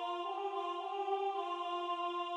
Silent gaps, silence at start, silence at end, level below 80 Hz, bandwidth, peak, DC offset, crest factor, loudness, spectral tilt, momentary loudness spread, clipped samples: none; 0 s; 0 s; under -90 dBFS; 10.5 kHz; -24 dBFS; under 0.1%; 14 dB; -38 LUFS; -1.5 dB/octave; 3 LU; under 0.1%